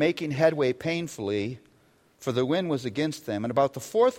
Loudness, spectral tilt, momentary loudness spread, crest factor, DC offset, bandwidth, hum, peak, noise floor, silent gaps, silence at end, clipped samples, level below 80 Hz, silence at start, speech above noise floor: -27 LUFS; -6 dB/octave; 7 LU; 18 dB; under 0.1%; 16.5 kHz; none; -8 dBFS; -62 dBFS; none; 0 s; under 0.1%; -66 dBFS; 0 s; 36 dB